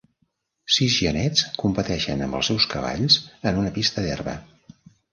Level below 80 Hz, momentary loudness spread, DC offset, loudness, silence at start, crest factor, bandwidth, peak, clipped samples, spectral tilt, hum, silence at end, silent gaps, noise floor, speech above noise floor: -44 dBFS; 9 LU; under 0.1%; -22 LUFS; 0.7 s; 20 dB; 10.5 kHz; -4 dBFS; under 0.1%; -4 dB/octave; none; 0.7 s; none; -71 dBFS; 48 dB